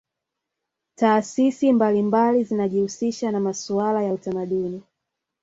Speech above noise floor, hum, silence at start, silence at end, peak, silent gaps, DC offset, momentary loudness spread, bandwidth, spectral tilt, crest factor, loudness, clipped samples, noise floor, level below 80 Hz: 62 dB; none; 1 s; 0.6 s; -4 dBFS; none; under 0.1%; 7 LU; 8 kHz; -6 dB/octave; 18 dB; -22 LUFS; under 0.1%; -83 dBFS; -66 dBFS